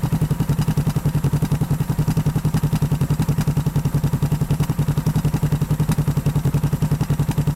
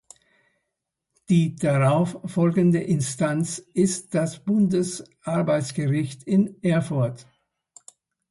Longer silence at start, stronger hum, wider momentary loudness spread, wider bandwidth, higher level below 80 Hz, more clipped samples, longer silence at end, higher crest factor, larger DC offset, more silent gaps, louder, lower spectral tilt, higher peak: second, 0 s vs 1.3 s; neither; second, 1 LU vs 7 LU; first, 16.5 kHz vs 11.5 kHz; first, -32 dBFS vs -62 dBFS; neither; second, 0 s vs 1.1 s; second, 8 dB vs 16 dB; first, 0.3% vs under 0.1%; neither; first, -20 LUFS vs -23 LUFS; about the same, -7.5 dB/octave vs -6.5 dB/octave; about the same, -10 dBFS vs -8 dBFS